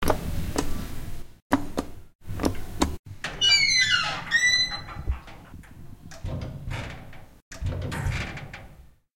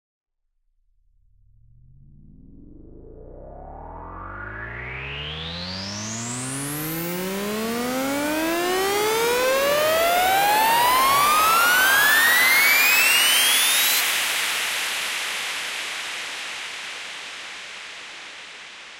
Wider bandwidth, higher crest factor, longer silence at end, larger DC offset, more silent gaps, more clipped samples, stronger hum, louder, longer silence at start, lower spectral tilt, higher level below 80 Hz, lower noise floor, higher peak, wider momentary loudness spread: about the same, 16.5 kHz vs 16 kHz; about the same, 22 dB vs 18 dB; first, 0.25 s vs 0 s; neither; first, 1.42-1.50 s, 2.15-2.19 s, 2.99-3.04 s, 7.42-7.51 s vs none; neither; neither; second, -25 LUFS vs -19 LUFS; second, 0 s vs 2.5 s; first, -2.5 dB/octave vs -1 dB/octave; first, -38 dBFS vs -50 dBFS; second, -50 dBFS vs -70 dBFS; about the same, -6 dBFS vs -6 dBFS; first, 25 LU vs 20 LU